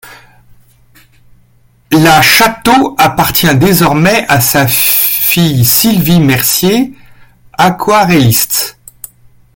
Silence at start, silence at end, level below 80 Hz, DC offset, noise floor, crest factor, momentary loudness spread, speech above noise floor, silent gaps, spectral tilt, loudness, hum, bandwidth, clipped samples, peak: 0.05 s; 0.85 s; -38 dBFS; under 0.1%; -47 dBFS; 10 dB; 6 LU; 39 dB; none; -4 dB/octave; -8 LUFS; none; over 20 kHz; 0.2%; 0 dBFS